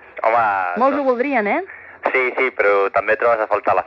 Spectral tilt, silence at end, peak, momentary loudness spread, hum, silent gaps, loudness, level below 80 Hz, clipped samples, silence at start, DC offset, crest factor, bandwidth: -6.5 dB/octave; 0 s; -2 dBFS; 5 LU; none; none; -18 LUFS; -62 dBFS; under 0.1%; 0.15 s; under 0.1%; 16 dB; 6.8 kHz